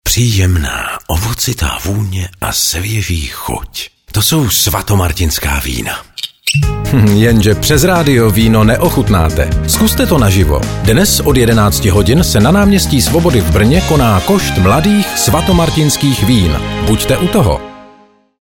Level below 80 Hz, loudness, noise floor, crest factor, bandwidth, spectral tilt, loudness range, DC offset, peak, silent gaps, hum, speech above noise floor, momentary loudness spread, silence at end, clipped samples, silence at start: -22 dBFS; -11 LUFS; -44 dBFS; 10 dB; 20 kHz; -5 dB/octave; 4 LU; under 0.1%; 0 dBFS; none; none; 34 dB; 8 LU; 0.55 s; under 0.1%; 0.05 s